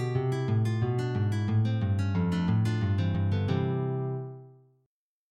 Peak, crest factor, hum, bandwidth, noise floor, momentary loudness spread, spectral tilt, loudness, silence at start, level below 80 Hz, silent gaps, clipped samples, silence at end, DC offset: -14 dBFS; 14 dB; none; 8.8 kHz; -79 dBFS; 5 LU; -8.5 dB/octave; -29 LUFS; 0 s; -60 dBFS; none; under 0.1%; 0.8 s; under 0.1%